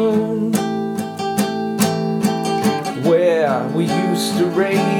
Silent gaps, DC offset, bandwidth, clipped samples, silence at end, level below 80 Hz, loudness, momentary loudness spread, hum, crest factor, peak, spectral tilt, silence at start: none; under 0.1%; 19 kHz; under 0.1%; 0 s; -68 dBFS; -18 LUFS; 6 LU; none; 16 dB; -2 dBFS; -5.5 dB/octave; 0 s